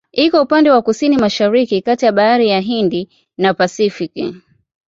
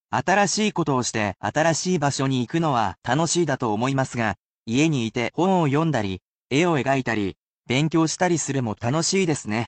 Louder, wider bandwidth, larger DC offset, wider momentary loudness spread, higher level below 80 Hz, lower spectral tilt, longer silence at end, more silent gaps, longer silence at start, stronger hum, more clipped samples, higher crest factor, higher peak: first, -14 LUFS vs -22 LUFS; second, 7.8 kHz vs 9.2 kHz; neither; first, 11 LU vs 5 LU; about the same, -56 dBFS vs -58 dBFS; about the same, -5.5 dB/octave vs -4.5 dB/octave; first, 0.5 s vs 0 s; second, none vs 2.98-3.02 s, 4.39-4.66 s, 6.24-6.46 s, 7.38-7.58 s; about the same, 0.15 s vs 0.1 s; neither; neither; about the same, 12 dB vs 14 dB; first, -2 dBFS vs -8 dBFS